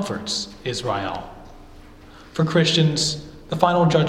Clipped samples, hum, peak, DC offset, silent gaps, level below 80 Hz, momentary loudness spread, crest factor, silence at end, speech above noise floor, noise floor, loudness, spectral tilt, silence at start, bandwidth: under 0.1%; none; 0 dBFS; under 0.1%; none; -46 dBFS; 15 LU; 22 dB; 0 s; 23 dB; -44 dBFS; -21 LUFS; -5 dB/octave; 0 s; 12 kHz